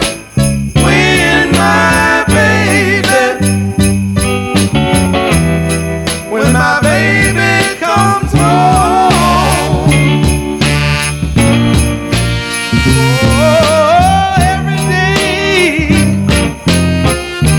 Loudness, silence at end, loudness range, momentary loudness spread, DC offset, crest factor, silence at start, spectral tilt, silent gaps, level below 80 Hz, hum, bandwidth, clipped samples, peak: -10 LUFS; 0 s; 2 LU; 5 LU; under 0.1%; 10 dB; 0 s; -5 dB/octave; none; -22 dBFS; none; 18 kHz; under 0.1%; 0 dBFS